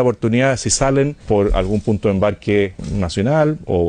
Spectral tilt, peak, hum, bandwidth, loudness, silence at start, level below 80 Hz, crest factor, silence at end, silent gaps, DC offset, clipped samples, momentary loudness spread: -5.5 dB/octave; -4 dBFS; none; 10 kHz; -17 LUFS; 0 s; -30 dBFS; 14 dB; 0 s; none; under 0.1%; under 0.1%; 3 LU